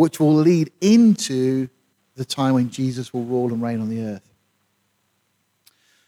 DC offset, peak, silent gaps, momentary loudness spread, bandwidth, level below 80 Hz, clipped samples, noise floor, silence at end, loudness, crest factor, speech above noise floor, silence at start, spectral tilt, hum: under 0.1%; -4 dBFS; none; 14 LU; 15 kHz; -66 dBFS; under 0.1%; -69 dBFS; 1.9 s; -19 LUFS; 16 dB; 50 dB; 0 s; -6.5 dB/octave; none